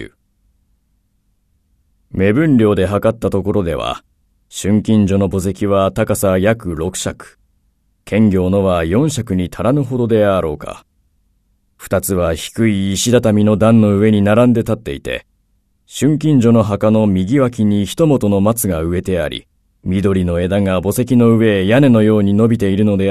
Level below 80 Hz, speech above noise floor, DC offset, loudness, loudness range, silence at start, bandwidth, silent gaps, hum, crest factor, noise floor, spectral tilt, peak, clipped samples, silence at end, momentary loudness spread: -40 dBFS; 48 dB; under 0.1%; -14 LUFS; 4 LU; 0 s; 14 kHz; none; none; 14 dB; -61 dBFS; -6.5 dB/octave; 0 dBFS; under 0.1%; 0 s; 11 LU